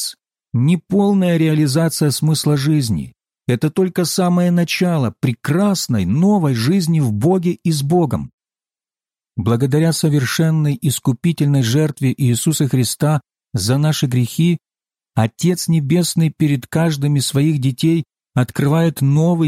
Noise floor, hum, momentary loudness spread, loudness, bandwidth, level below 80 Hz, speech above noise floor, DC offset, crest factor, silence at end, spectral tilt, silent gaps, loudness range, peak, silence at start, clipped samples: under -90 dBFS; none; 6 LU; -17 LUFS; 16 kHz; -50 dBFS; over 75 dB; under 0.1%; 12 dB; 0 s; -6 dB/octave; 8.33-8.38 s; 2 LU; -4 dBFS; 0 s; under 0.1%